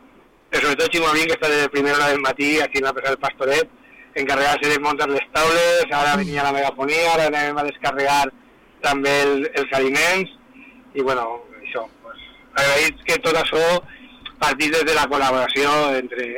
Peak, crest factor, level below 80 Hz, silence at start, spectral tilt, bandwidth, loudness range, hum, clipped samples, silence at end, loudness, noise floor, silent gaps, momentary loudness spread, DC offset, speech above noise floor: -12 dBFS; 8 dB; -50 dBFS; 0.5 s; -3 dB/octave; 19 kHz; 3 LU; none; under 0.1%; 0 s; -19 LUFS; -51 dBFS; none; 10 LU; under 0.1%; 32 dB